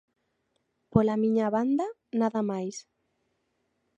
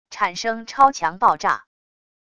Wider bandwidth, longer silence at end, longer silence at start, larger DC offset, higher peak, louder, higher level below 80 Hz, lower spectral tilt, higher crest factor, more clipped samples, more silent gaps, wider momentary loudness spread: second, 8.2 kHz vs 10 kHz; first, 1.15 s vs 0.75 s; first, 0.95 s vs 0.1 s; neither; second, -6 dBFS vs 0 dBFS; second, -28 LUFS vs -20 LUFS; about the same, -58 dBFS vs -60 dBFS; first, -7.5 dB/octave vs -2.5 dB/octave; about the same, 22 dB vs 20 dB; neither; neither; about the same, 9 LU vs 9 LU